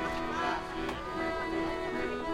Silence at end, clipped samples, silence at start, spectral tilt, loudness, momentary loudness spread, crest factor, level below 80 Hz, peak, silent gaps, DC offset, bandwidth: 0 s; under 0.1%; 0 s; -5 dB/octave; -34 LUFS; 3 LU; 14 dB; -48 dBFS; -20 dBFS; none; under 0.1%; 15.5 kHz